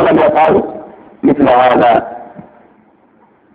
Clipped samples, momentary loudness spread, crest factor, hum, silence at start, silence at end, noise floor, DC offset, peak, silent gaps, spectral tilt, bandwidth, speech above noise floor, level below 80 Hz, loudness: under 0.1%; 19 LU; 12 dB; none; 0 s; 1.15 s; -49 dBFS; under 0.1%; 0 dBFS; none; -8.5 dB/octave; 5 kHz; 40 dB; -46 dBFS; -10 LUFS